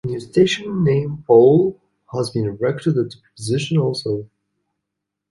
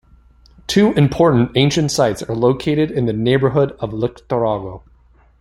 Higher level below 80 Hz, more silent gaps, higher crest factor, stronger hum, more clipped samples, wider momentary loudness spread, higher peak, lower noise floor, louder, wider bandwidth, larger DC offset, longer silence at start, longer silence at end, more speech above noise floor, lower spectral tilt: second, -54 dBFS vs -44 dBFS; neither; about the same, 18 dB vs 16 dB; first, 50 Hz at -45 dBFS vs none; neither; first, 13 LU vs 9 LU; about the same, -2 dBFS vs -2 dBFS; first, -81 dBFS vs -51 dBFS; about the same, -18 LUFS vs -17 LUFS; about the same, 11.5 kHz vs 12.5 kHz; neither; second, 0.05 s vs 0.7 s; first, 1.05 s vs 0.6 s; first, 63 dB vs 35 dB; about the same, -6.5 dB/octave vs -6 dB/octave